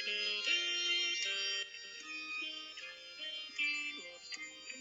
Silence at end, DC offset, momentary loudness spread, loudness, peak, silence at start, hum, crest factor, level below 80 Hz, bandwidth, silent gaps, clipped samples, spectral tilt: 0 s; under 0.1%; 14 LU; -36 LUFS; -22 dBFS; 0 s; none; 18 dB; -84 dBFS; 16.5 kHz; none; under 0.1%; 2 dB/octave